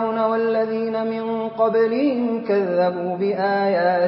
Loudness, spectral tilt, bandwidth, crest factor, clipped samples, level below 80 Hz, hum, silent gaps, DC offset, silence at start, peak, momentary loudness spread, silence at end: -21 LUFS; -11 dB/octave; 5.8 kHz; 14 dB; under 0.1%; -68 dBFS; none; none; under 0.1%; 0 s; -6 dBFS; 5 LU; 0 s